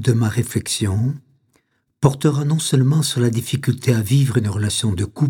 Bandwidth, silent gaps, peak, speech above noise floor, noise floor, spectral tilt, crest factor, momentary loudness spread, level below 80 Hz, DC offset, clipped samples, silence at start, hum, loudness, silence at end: 17 kHz; none; 0 dBFS; 46 dB; -64 dBFS; -5.5 dB/octave; 18 dB; 5 LU; -50 dBFS; under 0.1%; under 0.1%; 0 s; none; -19 LUFS; 0 s